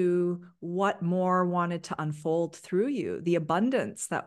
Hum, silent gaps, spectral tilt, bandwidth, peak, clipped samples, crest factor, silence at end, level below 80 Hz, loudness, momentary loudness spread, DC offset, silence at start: none; none; -6.5 dB/octave; 12.5 kHz; -14 dBFS; under 0.1%; 14 dB; 0 s; -74 dBFS; -29 LUFS; 6 LU; under 0.1%; 0 s